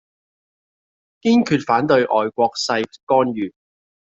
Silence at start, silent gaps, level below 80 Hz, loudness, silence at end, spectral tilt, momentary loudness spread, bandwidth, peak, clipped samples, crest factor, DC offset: 1.25 s; 3.03-3.07 s; -62 dBFS; -18 LUFS; 0.65 s; -5 dB/octave; 8 LU; 8 kHz; -2 dBFS; under 0.1%; 18 dB; under 0.1%